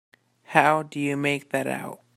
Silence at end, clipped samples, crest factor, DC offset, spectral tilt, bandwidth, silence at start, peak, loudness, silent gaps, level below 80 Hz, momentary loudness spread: 0.2 s; under 0.1%; 26 dB; under 0.1%; -5 dB/octave; 16 kHz; 0.5 s; 0 dBFS; -24 LUFS; none; -70 dBFS; 9 LU